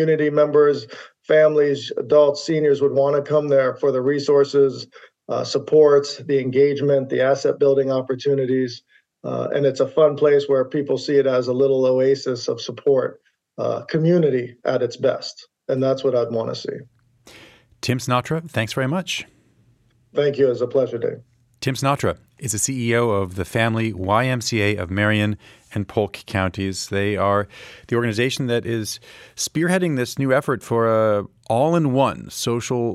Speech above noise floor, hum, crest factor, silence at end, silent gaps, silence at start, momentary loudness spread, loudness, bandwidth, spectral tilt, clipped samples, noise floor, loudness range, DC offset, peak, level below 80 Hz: 39 dB; none; 16 dB; 0 s; none; 0 s; 11 LU; -20 LUFS; 14 kHz; -5.5 dB/octave; under 0.1%; -59 dBFS; 6 LU; under 0.1%; -2 dBFS; -58 dBFS